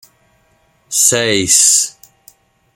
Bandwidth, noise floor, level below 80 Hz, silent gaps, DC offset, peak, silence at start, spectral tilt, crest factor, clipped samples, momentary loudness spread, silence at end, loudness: over 20 kHz; -56 dBFS; -56 dBFS; none; under 0.1%; 0 dBFS; 0.9 s; -1 dB/octave; 16 dB; under 0.1%; 10 LU; 0.85 s; -10 LUFS